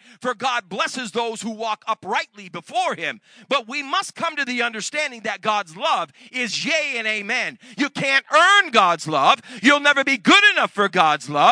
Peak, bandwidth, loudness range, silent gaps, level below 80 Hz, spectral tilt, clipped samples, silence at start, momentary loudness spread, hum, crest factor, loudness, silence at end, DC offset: 0 dBFS; 10.5 kHz; 9 LU; none; -80 dBFS; -2.5 dB/octave; under 0.1%; 0.2 s; 13 LU; none; 20 dB; -19 LUFS; 0 s; under 0.1%